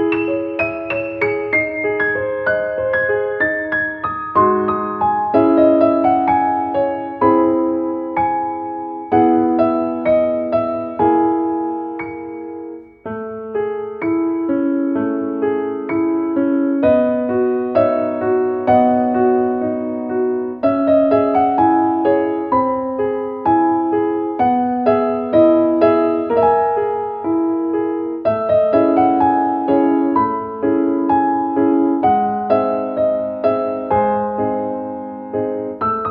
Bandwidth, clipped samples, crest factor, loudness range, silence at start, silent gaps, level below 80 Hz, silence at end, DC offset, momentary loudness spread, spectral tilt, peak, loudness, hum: 5 kHz; under 0.1%; 16 dB; 4 LU; 0 s; none; -52 dBFS; 0 s; under 0.1%; 8 LU; -10 dB/octave; 0 dBFS; -17 LUFS; none